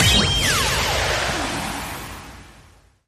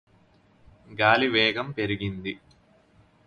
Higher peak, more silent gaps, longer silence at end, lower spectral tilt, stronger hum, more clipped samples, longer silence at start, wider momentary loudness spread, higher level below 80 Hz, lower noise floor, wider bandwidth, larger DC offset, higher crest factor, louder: about the same, -4 dBFS vs -4 dBFS; neither; second, 0.55 s vs 0.9 s; second, -2.5 dB/octave vs -6.5 dB/octave; neither; neither; second, 0 s vs 0.9 s; about the same, 19 LU vs 18 LU; first, -34 dBFS vs -56 dBFS; second, -51 dBFS vs -60 dBFS; first, 15.5 kHz vs 11 kHz; neither; second, 18 dB vs 24 dB; first, -20 LUFS vs -24 LUFS